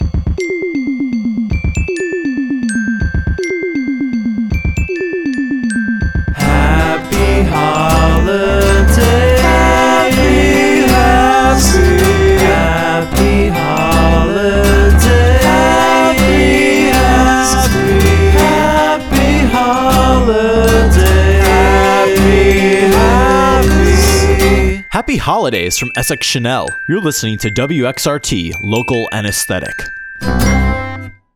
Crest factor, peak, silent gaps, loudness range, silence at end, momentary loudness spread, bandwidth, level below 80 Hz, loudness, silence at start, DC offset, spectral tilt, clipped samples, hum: 10 dB; 0 dBFS; none; 7 LU; 0.25 s; 8 LU; 18.5 kHz; -16 dBFS; -11 LUFS; 0 s; under 0.1%; -5 dB/octave; under 0.1%; none